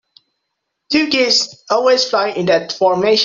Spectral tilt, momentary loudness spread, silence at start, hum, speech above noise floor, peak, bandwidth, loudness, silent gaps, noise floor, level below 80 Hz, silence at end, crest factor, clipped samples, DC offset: -3 dB/octave; 4 LU; 0.9 s; none; 60 dB; -2 dBFS; 7.8 kHz; -15 LUFS; none; -74 dBFS; -60 dBFS; 0 s; 14 dB; under 0.1%; under 0.1%